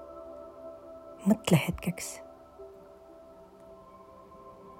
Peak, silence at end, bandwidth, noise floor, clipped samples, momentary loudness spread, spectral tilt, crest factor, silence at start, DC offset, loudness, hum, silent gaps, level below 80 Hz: -10 dBFS; 0.05 s; 16 kHz; -52 dBFS; under 0.1%; 26 LU; -5.5 dB/octave; 24 dB; 0 s; under 0.1%; -29 LUFS; none; none; -58 dBFS